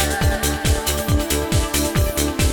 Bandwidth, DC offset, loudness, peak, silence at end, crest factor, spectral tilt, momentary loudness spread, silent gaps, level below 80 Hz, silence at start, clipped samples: over 20 kHz; under 0.1%; -19 LUFS; -4 dBFS; 0 s; 14 dB; -4 dB/octave; 1 LU; none; -24 dBFS; 0 s; under 0.1%